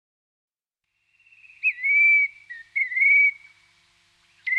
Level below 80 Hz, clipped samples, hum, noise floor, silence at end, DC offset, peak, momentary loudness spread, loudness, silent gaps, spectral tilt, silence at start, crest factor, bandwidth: -82 dBFS; under 0.1%; none; -81 dBFS; 0 s; under 0.1%; -12 dBFS; 14 LU; -18 LUFS; none; 1.5 dB/octave; 1.65 s; 14 dB; 7.4 kHz